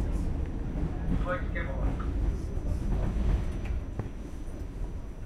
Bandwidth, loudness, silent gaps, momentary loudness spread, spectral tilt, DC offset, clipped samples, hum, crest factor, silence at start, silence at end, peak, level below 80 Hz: 10 kHz; -34 LUFS; none; 9 LU; -8 dB/octave; under 0.1%; under 0.1%; none; 14 dB; 0 s; 0 s; -16 dBFS; -32 dBFS